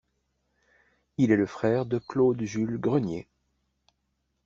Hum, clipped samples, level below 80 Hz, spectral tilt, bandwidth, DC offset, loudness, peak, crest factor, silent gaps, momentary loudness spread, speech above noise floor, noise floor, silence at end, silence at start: none; under 0.1%; -62 dBFS; -7.5 dB/octave; 7.4 kHz; under 0.1%; -26 LUFS; -8 dBFS; 20 dB; none; 9 LU; 51 dB; -77 dBFS; 1.25 s; 1.2 s